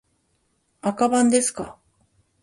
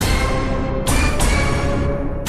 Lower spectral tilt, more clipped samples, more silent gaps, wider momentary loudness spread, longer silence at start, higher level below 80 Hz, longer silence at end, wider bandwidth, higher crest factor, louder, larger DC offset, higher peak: second, -3.5 dB/octave vs -5 dB/octave; neither; neither; first, 17 LU vs 4 LU; first, 0.85 s vs 0 s; second, -62 dBFS vs -22 dBFS; first, 0.7 s vs 0 s; second, 11.5 kHz vs 14.5 kHz; about the same, 18 dB vs 14 dB; about the same, -21 LUFS vs -19 LUFS; neither; about the same, -6 dBFS vs -4 dBFS